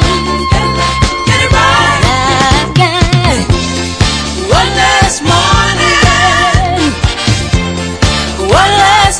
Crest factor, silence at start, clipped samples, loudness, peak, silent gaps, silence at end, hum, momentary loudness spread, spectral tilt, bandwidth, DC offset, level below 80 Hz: 10 dB; 0 s; 2%; -9 LUFS; 0 dBFS; none; 0 s; none; 6 LU; -4 dB/octave; 11 kHz; under 0.1%; -20 dBFS